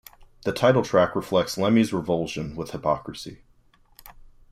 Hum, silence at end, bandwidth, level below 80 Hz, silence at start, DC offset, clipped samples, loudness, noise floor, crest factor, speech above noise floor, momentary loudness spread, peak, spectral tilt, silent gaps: none; 0.4 s; 15.5 kHz; -52 dBFS; 0.2 s; under 0.1%; under 0.1%; -24 LUFS; -58 dBFS; 18 dB; 35 dB; 12 LU; -6 dBFS; -6 dB/octave; none